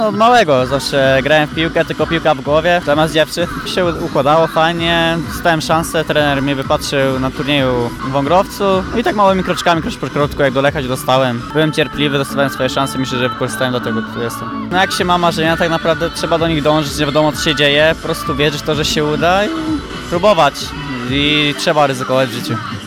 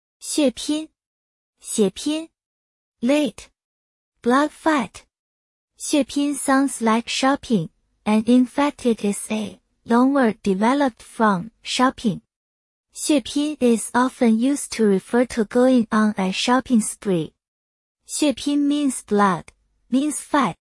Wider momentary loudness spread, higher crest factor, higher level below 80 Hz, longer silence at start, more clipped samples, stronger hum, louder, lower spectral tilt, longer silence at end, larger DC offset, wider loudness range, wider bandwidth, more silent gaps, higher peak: about the same, 7 LU vs 9 LU; about the same, 14 dB vs 16 dB; first, -36 dBFS vs -58 dBFS; second, 0 s vs 0.2 s; neither; neither; first, -14 LUFS vs -21 LUFS; about the same, -4.5 dB/octave vs -4.5 dB/octave; about the same, 0 s vs 0.1 s; neither; second, 2 LU vs 5 LU; first, 19.5 kHz vs 12 kHz; second, none vs 1.06-1.53 s, 2.46-2.92 s, 3.64-4.12 s, 5.19-5.68 s, 12.36-12.84 s, 17.48-17.95 s; first, 0 dBFS vs -4 dBFS